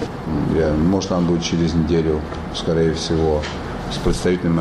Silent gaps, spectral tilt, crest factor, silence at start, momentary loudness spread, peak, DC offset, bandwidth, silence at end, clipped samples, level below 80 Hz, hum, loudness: none; -6.5 dB/octave; 14 dB; 0 s; 7 LU; -6 dBFS; under 0.1%; 12 kHz; 0 s; under 0.1%; -32 dBFS; none; -20 LUFS